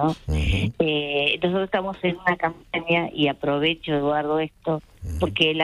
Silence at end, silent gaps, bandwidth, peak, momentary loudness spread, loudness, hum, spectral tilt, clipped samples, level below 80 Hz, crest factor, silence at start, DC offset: 0 s; none; 12.5 kHz; -6 dBFS; 6 LU; -23 LUFS; none; -6.5 dB/octave; under 0.1%; -38 dBFS; 18 dB; 0 s; under 0.1%